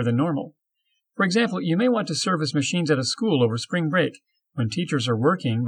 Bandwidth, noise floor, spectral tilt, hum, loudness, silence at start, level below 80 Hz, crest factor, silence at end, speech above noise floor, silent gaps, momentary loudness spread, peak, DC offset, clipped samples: 11 kHz; -75 dBFS; -5.5 dB/octave; none; -23 LUFS; 0 s; -74 dBFS; 16 dB; 0 s; 52 dB; none; 7 LU; -6 dBFS; under 0.1%; under 0.1%